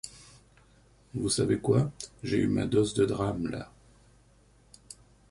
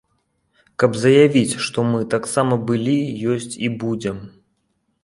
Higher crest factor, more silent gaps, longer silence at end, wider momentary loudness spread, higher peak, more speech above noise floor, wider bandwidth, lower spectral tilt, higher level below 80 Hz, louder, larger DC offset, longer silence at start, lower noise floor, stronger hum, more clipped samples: about the same, 20 dB vs 18 dB; neither; second, 0.35 s vs 0.75 s; first, 23 LU vs 12 LU; second, -12 dBFS vs -2 dBFS; second, 33 dB vs 51 dB; about the same, 11.5 kHz vs 11.5 kHz; about the same, -6 dB/octave vs -5.5 dB/octave; about the same, -54 dBFS vs -56 dBFS; second, -29 LUFS vs -19 LUFS; neither; second, 0.05 s vs 0.8 s; second, -61 dBFS vs -69 dBFS; first, 50 Hz at -45 dBFS vs none; neither